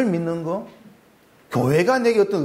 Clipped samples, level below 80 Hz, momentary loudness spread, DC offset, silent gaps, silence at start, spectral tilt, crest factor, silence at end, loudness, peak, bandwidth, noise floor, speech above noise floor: under 0.1%; -60 dBFS; 12 LU; under 0.1%; none; 0 s; -6.5 dB/octave; 14 dB; 0 s; -21 LUFS; -8 dBFS; 16 kHz; -54 dBFS; 34 dB